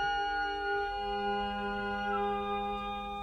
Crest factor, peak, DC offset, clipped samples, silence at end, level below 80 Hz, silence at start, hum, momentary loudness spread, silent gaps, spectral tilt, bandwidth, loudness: 12 dB; -22 dBFS; under 0.1%; under 0.1%; 0 s; -52 dBFS; 0 s; none; 3 LU; none; -5 dB/octave; 9 kHz; -34 LUFS